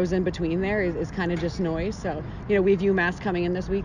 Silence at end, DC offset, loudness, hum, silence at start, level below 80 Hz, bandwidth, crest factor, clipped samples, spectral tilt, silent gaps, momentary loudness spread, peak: 0 s; under 0.1%; -25 LUFS; none; 0 s; -40 dBFS; 9.2 kHz; 14 dB; under 0.1%; -7 dB/octave; none; 8 LU; -10 dBFS